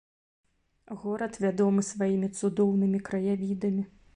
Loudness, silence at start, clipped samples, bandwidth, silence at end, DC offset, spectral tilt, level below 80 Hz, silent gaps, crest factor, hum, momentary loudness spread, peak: -28 LUFS; 0.9 s; under 0.1%; 10.5 kHz; 0.3 s; under 0.1%; -7 dB/octave; -64 dBFS; none; 14 dB; none; 8 LU; -14 dBFS